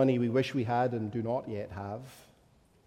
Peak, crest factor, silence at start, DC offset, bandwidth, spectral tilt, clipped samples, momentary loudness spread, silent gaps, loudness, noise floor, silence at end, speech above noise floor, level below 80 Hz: -14 dBFS; 18 dB; 0 s; under 0.1%; 14 kHz; -7.5 dB/octave; under 0.1%; 13 LU; none; -32 LUFS; -64 dBFS; 0.65 s; 33 dB; -68 dBFS